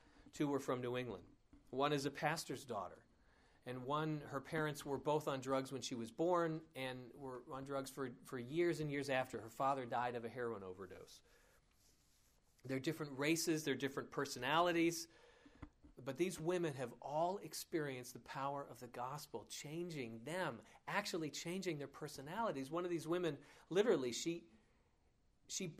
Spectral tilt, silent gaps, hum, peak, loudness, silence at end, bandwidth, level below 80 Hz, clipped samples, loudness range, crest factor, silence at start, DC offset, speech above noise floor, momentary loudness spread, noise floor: -4.5 dB/octave; none; none; -22 dBFS; -42 LUFS; 0 s; 15.5 kHz; -74 dBFS; under 0.1%; 5 LU; 22 dB; 0.15 s; under 0.1%; 34 dB; 13 LU; -76 dBFS